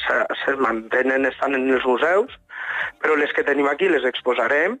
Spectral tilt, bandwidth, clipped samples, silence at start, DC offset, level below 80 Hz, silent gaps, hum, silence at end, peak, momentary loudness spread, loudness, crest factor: -4.5 dB/octave; 9 kHz; under 0.1%; 0 s; under 0.1%; -60 dBFS; none; none; 0 s; -8 dBFS; 6 LU; -20 LUFS; 14 dB